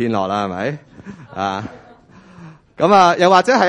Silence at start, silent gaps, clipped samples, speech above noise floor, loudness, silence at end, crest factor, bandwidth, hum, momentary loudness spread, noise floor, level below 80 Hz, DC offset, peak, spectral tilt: 0 s; none; under 0.1%; 30 dB; -15 LUFS; 0 s; 16 dB; 11 kHz; none; 22 LU; -44 dBFS; -58 dBFS; under 0.1%; 0 dBFS; -5 dB/octave